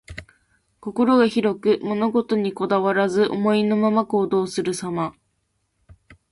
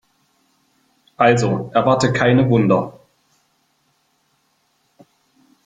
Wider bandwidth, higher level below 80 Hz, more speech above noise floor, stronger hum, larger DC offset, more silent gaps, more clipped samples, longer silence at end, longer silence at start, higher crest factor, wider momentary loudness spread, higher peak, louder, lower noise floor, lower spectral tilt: first, 11.5 kHz vs 9.2 kHz; about the same, -56 dBFS vs -52 dBFS; about the same, 51 dB vs 49 dB; neither; neither; neither; neither; second, 0.2 s vs 2.75 s; second, 0.1 s vs 1.2 s; about the same, 16 dB vs 20 dB; first, 11 LU vs 4 LU; second, -6 dBFS vs -2 dBFS; second, -21 LUFS vs -16 LUFS; first, -71 dBFS vs -64 dBFS; about the same, -6 dB/octave vs -6.5 dB/octave